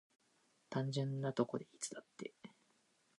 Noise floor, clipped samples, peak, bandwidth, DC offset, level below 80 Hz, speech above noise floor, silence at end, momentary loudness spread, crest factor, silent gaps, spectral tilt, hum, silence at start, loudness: -76 dBFS; under 0.1%; -20 dBFS; 11 kHz; under 0.1%; -88 dBFS; 35 dB; 0.7 s; 14 LU; 24 dB; none; -5.5 dB/octave; none; 0.7 s; -42 LUFS